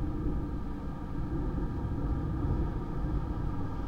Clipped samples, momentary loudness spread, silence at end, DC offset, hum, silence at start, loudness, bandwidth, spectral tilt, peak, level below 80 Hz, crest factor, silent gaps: under 0.1%; 6 LU; 0 s; under 0.1%; none; 0 s; -35 LUFS; 6.4 kHz; -9.5 dB/octave; -20 dBFS; -36 dBFS; 12 dB; none